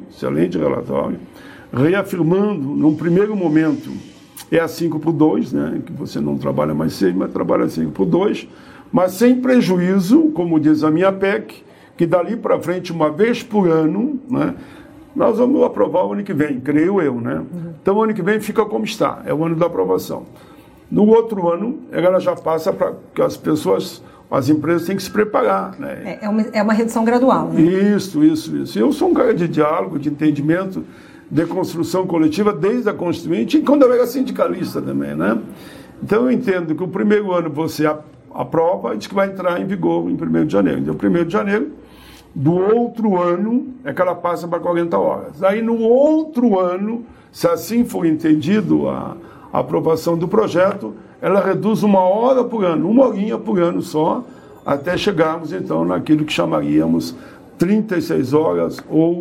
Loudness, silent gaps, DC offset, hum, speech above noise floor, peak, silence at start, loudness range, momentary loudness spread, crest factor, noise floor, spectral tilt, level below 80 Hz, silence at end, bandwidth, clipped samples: -17 LUFS; none; under 0.1%; none; 25 dB; 0 dBFS; 0 s; 3 LU; 9 LU; 16 dB; -42 dBFS; -7 dB/octave; -52 dBFS; 0 s; 16 kHz; under 0.1%